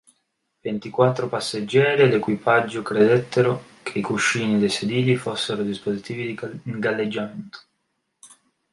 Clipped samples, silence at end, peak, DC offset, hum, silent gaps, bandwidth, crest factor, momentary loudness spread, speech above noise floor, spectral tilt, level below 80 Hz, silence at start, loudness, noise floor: under 0.1%; 0.45 s; -4 dBFS; under 0.1%; none; none; 11.5 kHz; 18 dB; 12 LU; 53 dB; -5.5 dB/octave; -64 dBFS; 0.65 s; -22 LUFS; -74 dBFS